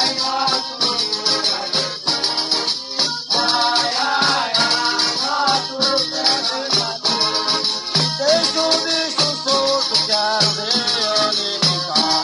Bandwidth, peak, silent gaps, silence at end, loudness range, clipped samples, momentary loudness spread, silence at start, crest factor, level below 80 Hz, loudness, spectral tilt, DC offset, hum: 12 kHz; -4 dBFS; none; 0 s; 1 LU; under 0.1%; 3 LU; 0 s; 16 dB; -60 dBFS; -16 LUFS; -2 dB/octave; under 0.1%; none